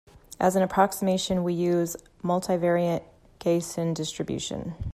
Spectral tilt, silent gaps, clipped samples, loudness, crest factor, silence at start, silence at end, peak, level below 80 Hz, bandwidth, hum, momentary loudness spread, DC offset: -5.5 dB/octave; none; under 0.1%; -26 LUFS; 18 dB; 0.3 s; 0 s; -8 dBFS; -50 dBFS; 15 kHz; none; 9 LU; under 0.1%